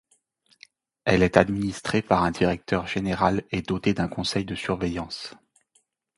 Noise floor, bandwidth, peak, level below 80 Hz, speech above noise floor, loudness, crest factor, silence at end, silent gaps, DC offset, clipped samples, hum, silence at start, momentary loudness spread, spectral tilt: -68 dBFS; 11.5 kHz; 0 dBFS; -46 dBFS; 44 dB; -25 LUFS; 26 dB; 0.85 s; none; under 0.1%; under 0.1%; none; 1.05 s; 9 LU; -6 dB/octave